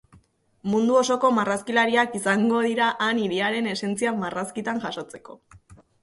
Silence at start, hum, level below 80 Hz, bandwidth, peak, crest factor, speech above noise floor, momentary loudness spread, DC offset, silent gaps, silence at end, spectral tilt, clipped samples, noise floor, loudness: 0.65 s; none; -64 dBFS; 11.5 kHz; -8 dBFS; 16 dB; 35 dB; 10 LU; under 0.1%; none; 0.3 s; -4.5 dB/octave; under 0.1%; -58 dBFS; -23 LUFS